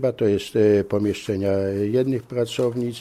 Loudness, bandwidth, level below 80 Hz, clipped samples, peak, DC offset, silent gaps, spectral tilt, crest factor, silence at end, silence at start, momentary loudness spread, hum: -22 LUFS; 14 kHz; -56 dBFS; under 0.1%; -6 dBFS; under 0.1%; none; -7 dB/octave; 14 dB; 0 s; 0 s; 6 LU; none